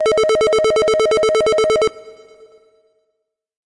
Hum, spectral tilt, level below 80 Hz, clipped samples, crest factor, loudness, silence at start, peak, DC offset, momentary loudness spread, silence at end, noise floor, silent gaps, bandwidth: none; -2.5 dB/octave; -48 dBFS; under 0.1%; 8 dB; -15 LUFS; 0 s; -10 dBFS; under 0.1%; 2 LU; 1.6 s; -73 dBFS; none; 11.5 kHz